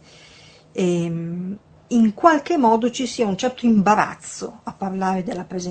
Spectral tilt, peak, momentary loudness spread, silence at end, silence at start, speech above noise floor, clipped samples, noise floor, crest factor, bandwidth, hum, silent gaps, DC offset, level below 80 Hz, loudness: -5.5 dB/octave; 0 dBFS; 16 LU; 0 s; 0.75 s; 28 dB; under 0.1%; -48 dBFS; 20 dB; 9 kHz; none; none; under 0.1%; -58 dBFS; -20 LUFS